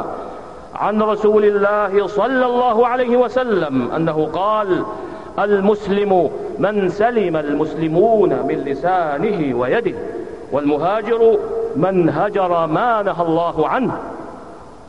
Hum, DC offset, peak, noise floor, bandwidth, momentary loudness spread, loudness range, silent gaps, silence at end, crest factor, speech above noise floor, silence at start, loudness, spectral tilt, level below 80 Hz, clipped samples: none; 0.6%; -4 dBFS; -37 dBFS; 8.2 kHz; 13 LU; 2 LU; none; 0 s; 14 dB; 21 dB; 0 s; -17 LUFS; -8 dB/octave; -50 dBFS; under 0.1%